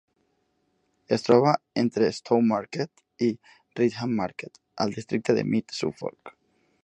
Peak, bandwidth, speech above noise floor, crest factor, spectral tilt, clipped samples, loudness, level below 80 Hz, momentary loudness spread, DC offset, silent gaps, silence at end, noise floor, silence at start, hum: -4 dBFS; 8.8 kHz; 47 dB; 24 dB; -6.5 dB/octave; under 0.1%; -26 LUFS; -66 dBFS; 16 LU; under 0.1%; none; 0.55 s; -72 dBFS; 1.1 s; none